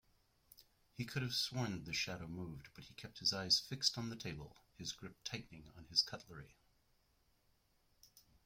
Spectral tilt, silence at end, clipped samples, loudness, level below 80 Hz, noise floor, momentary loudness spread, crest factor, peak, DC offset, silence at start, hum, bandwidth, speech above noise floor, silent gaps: -3 dB/octave; 0.25 s; under 0.1%; -40 LUFS; -70 dBFS; -77 dBFS; 21 LU; 26 dB; -20 dBFS; under 0.1%; 0.6 s; none; 16.5 kHz; 34 dB; none